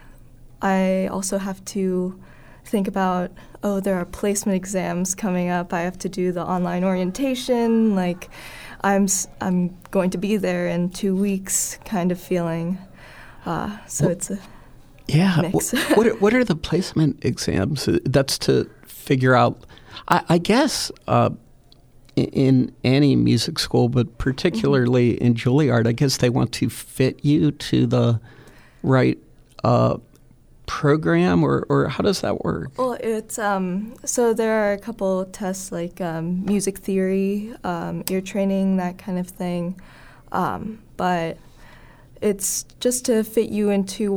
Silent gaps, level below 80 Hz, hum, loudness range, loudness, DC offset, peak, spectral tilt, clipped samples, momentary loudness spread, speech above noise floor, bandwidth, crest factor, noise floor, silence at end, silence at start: none; -46 dBFS; none; 5 LU; -21 LUFS; under 0.1%; -2 dBFS; -5.5 dB/octave; under 0.1%; 10 LU; 30 dB; over 20 kHz; 20 dB; -50 dBFS; 0 s; 0.05 s